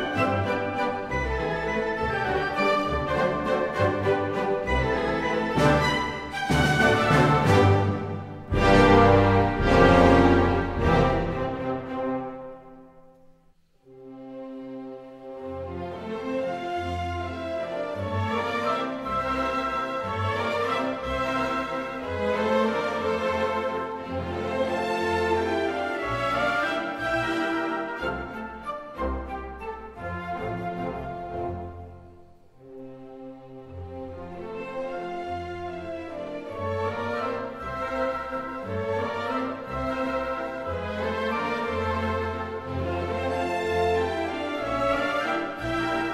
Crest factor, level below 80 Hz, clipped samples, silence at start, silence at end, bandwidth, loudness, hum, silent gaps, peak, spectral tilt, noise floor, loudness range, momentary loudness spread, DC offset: 22 dB; -40 dBFS; under 0.1%; 0 s; 0 s; 14.5 kHz; -26 LUFS; none; none; -4 dBFS; -6.5 dB/octave; -60 dBFS; 16 LU; 16 LU; under 0.1%